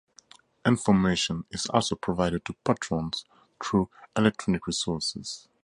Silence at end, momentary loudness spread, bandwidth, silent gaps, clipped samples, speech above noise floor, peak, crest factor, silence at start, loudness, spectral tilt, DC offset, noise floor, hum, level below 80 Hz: 0.25 s; 9 LU; 11.5 kHz; none; under 0.1%; 30 dB; -6 dBFS; 22 dB; 0.65 s; -27 LUFS; -5 dB/octave; under 0.1%; -56 dBFS; none; -52 dBFS